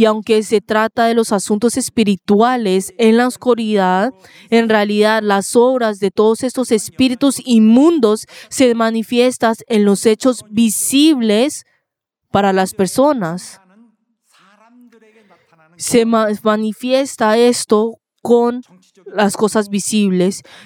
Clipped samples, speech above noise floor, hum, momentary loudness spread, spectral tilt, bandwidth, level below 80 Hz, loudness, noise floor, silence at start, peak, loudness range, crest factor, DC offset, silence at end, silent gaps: under 0.1%; 62 dB; none; 6 LU; -4.5 dB/octave; 17.5 kHz; -58 dBFS; -14 LUFS; -76 dBFS; 0 s; 0 dBFS; 6 LU; 14 dB; under 0.1%; 0.25 s; none